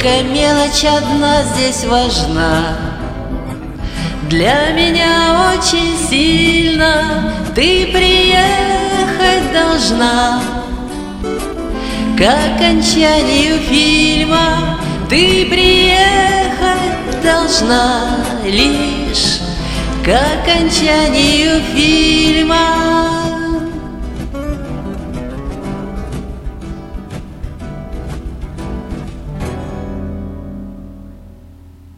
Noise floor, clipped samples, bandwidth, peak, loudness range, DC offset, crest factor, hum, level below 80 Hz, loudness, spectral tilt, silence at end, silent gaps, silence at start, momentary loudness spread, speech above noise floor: -38 dBFS; under 0.1%; 15.5 kHz; 0 dBFS; 15 LU; under 0.1%; 14 dB; none; -26 dBFS; -12 LUFS; -3.5 dB/octave; 0.05 s; none; 0 s; 16 LU; 26 dB